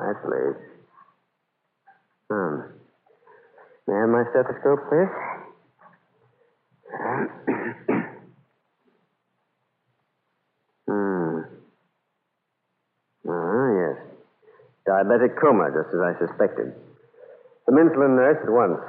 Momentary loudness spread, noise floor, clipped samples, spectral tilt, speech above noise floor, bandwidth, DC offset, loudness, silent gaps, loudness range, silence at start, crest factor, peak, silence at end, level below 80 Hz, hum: 16 LU; -77 dBFS; under 0.1%; -11.5 dB/octave; 56 dB; 3.3 kHz; under 0.1%; -23 LUFS; none; 11 LU; 0 s; 20 dB; -6 dBFS; 0 s; -78 dBFS; none